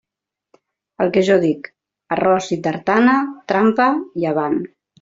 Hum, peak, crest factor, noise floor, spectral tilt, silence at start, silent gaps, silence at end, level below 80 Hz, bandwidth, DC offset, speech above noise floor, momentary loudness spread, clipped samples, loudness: none; -2 dBFS; 16 dB; -85 dBFS; -6 dB/octave; 1 s; none; 0.35 s; -60 dBFS; 7.8 kHz; under 0.1%; 68 dB; 10 LU; under 0.1%; -18 LUFS